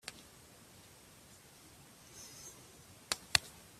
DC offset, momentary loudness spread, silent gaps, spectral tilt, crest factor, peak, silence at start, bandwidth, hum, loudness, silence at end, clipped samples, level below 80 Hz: under 0.1%; 25 LU; none; -0.5 dB/octave; 40 dB; -6 dBFS; 0.05 s; 15.5 kHz; none; -36 LUFS; 0 s; under 0.1%; -68 dBFS